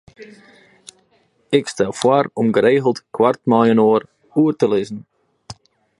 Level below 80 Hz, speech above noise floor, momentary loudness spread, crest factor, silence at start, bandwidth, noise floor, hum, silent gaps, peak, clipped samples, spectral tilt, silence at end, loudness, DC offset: -60 dBFS; 44 dB; 8 LU; 18 dB; 0.2 s; 11.5 kHz; -60 dBFS; none; none; 0 dBFS; under 0.1%; -6 dB/octave; 0.45 s; -17 LUFS; under 0.1%